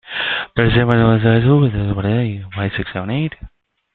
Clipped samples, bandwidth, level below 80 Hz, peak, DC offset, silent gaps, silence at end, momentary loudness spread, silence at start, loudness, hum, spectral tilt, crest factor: under 0.1%; 4.4 kHz; -36 dBFS; 0 dBFS; under 0.1%; none; 0.45 s; 10 LU; 0.05 s; -16 LUFS; none; -10 dB/octave; 16 dB